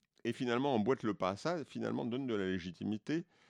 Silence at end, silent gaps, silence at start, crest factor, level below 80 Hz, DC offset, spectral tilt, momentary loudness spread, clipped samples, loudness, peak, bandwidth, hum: 0.25 s; none; 0.25 s; 18 dB; -74 dBFS; under 0.1%; -6.5 dB/octave; 7 LU; under 0.1%; -37 LUFS; -20 dBFS; 11 kHz; none